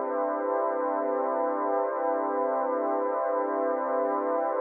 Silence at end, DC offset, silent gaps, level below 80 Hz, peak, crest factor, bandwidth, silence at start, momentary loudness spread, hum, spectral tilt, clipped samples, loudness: 0 s; under 0.1%; none; under -90 dBFS; -16 dBFS; 12 dB; 2.8 kHz; 0 s; 1 LU; none; -4 dB/octave; under 0.1%; -28 LUFS